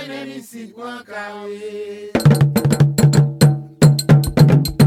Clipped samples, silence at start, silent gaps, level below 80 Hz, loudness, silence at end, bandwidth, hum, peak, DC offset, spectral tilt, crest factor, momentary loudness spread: under 0.1%; 0 s; none; -38 dBFS; -14 LUFS; 0 s; 16 kHz; none; 0 dBFS; under 0.1%; -6.5 dB/octave; 14 dB; 19 LU